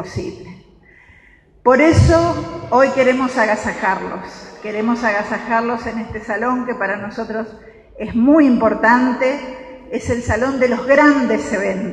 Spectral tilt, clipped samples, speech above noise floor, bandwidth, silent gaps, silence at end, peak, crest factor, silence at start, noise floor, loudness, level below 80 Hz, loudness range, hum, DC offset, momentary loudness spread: -6.5 dB/octave; under 0.1%; 33 dB; 10.5 kHz; none; 0 s; 0 dBFS; 16 dB; 0 s; -49 dBFS; -16 LUFS; -36 dBFS; 5 LU; none; under 0.1%; 16 LU